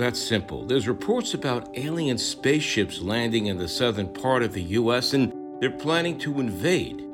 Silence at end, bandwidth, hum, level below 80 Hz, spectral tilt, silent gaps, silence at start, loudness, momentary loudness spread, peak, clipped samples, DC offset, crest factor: 0 s; 17.5 kHz; none; -56 dBFS; -4.5 dB/octave; none; 0 s; -25 LUFS; 5 LU; -10 dBFS; under 0.1%; under 0.1%; 16 dB